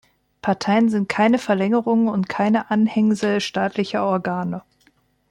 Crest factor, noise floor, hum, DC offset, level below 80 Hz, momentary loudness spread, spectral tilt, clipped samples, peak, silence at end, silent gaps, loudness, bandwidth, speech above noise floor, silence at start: 14 dB; -61 dBFS; none; under 0.1%; -62 dBFS; 7 LU; -6.5 dB/octave; under 0.1%; -6 dBFS; 0.7 s; none; -20 LUFS; 10.5 kHz; 41 dB; 0.45 s